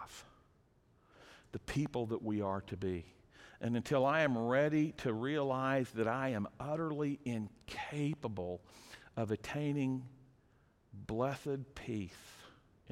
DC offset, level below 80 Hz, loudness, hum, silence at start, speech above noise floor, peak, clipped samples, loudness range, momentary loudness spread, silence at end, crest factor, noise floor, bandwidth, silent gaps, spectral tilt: under 0.1%; -64 dBFS; -37 LUFS; none; 0 s; 33 dB; -20 dBFS; under 0.1%; 7 LU; 17 LU; 0 s; 18 dB; -70 dBFS; 15.5 kHz; none; -7 dB/octave